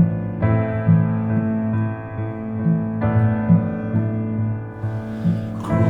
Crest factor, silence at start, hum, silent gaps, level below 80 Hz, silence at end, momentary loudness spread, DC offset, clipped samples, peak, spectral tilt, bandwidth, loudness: 16 dB; 0 s; none; none; -44 dBFS; 0 s; 9 LU; under 0.1%; under 0.1%; -4 dBFS; -10.5 dB/octave; 3.7 kHz; -21 LUFS